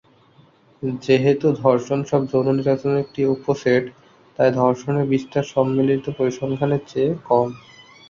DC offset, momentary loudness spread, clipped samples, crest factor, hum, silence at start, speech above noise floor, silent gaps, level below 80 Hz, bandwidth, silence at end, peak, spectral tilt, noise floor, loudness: under 0.1%; 6 LU; under 0.1%; 18 dB; none; 0.8 s; 34 dB; none; -58 dBFS; 7.4 kHz; 0.5 s; -2 dBFS; -7.5 dB/octave; -53 dBFS; -20 LUFS